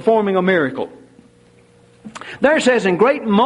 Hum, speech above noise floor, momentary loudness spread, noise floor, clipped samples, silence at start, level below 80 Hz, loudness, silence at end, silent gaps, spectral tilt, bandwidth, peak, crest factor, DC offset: none; 35 dB; 18 LU; -50 dBFS; under 0.1%; 0 s; -58 dBFS; -16 LUFS; 0 s; none; -5.5 dB/octave; 11 kHz; -2 dBFS; 14 dB; under 0.1%